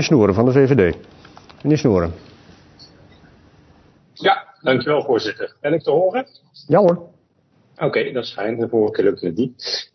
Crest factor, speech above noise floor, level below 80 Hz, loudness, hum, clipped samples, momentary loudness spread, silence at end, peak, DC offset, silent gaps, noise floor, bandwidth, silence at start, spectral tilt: 18 dB; 41 dB; -50 dBFS; -18 LUFS; none; under 0.1%; 11 LU; 0.1 s; 0 dBFS; under 0.1%; none; -59 dBFS; 6.4 kHz; 0 s; -6.5 dB/octave